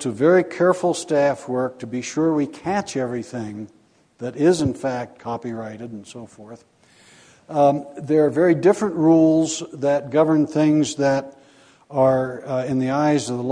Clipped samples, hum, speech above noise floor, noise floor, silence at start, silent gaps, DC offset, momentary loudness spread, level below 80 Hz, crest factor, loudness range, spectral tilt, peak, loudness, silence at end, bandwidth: under 0.1%; none; 32 dB; -52 dBFS; 0 s; none; under 0.1%; 16 LU; -60 dBFS; 16 dB; 8 LU; -6 dB/octave; -4 dBFS; -20 LUFS; 0 s; 10.5 kHz